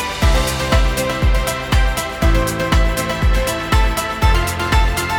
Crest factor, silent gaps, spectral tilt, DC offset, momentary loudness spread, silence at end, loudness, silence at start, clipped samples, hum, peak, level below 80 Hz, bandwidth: 14 dB; none; -4.5 dB/octave; under 0.1%; 2 LU; 0 s; -17 LUFS; 0 s; under 0.1%; none; -2 dBFS; -18 dBFS; 18.5 kHz